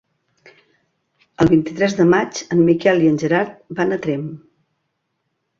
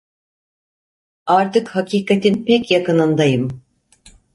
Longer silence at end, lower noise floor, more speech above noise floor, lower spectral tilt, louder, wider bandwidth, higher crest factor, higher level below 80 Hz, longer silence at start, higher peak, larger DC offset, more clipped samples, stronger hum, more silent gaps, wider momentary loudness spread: first, 1.2 s vs 0.75 s; first, -73 dBFS vs -50 dBFS; first, 56 dB vs 35 dB; about the same, -6.5 dB/octave vs -6.5 dB/octave; about the same, -17 LUFS vs -16 LUFS; second, 7.4 kHz vs 11.5 kHz; about the same, 16 dB vs 16 dB; first, -50 dBFS vs -56 dBFS; first, 1.4 s vs 1.25 s; about the same, -2 dBFS vs -2 dBFS; neither; neither; neither; neither; about the same, 9 LU vs 8 LU